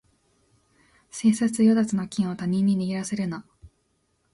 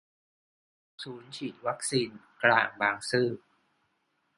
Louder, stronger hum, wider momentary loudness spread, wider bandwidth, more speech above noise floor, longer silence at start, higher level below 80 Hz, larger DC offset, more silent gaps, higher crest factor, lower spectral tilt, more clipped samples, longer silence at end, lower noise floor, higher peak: first, -24 LUFS vs -29 LUFS; neither; second, 11 LU vs 19 LU; about the same, 11.5 kHz vs 11.5 kHz; about the same, 47 dB vs 46 dB; first, 1.15 s vs 1 s; first, -60 dBFS vs -74 dBFS; neither; neither; second, 16 dB vs 26 dB; first, -6 dB/octave vs -3.5 dB/octave; neither; second, 0.65 s vs 1 s; second, -70 dBFS vs -76 dBFS; second, -10 dBFS vs -6 dBFS